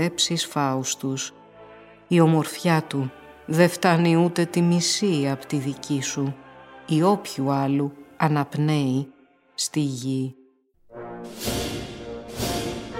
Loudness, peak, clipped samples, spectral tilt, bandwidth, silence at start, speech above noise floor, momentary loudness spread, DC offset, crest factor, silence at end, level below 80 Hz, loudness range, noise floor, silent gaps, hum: -23 LUFS; -4 dBFS; under 0.1%; -5 dB/octave; 16.5 kHz; 0 s; 36 dB; 15 LU; under 0.1%; 20 dB; 0 s; -52 dBFS; 8 LU; -58 dBFS; none; none